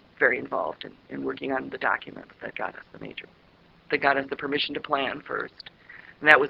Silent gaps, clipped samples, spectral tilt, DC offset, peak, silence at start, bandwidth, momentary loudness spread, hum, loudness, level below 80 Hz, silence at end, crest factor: none; under 0.1%; -5.5 dB/octave; under 0.1%; 0 dBFS; 0.2 s; 12 kHz; 19 LU; none; -27 LUFS; -64 dBFS; 0 s; 28 dB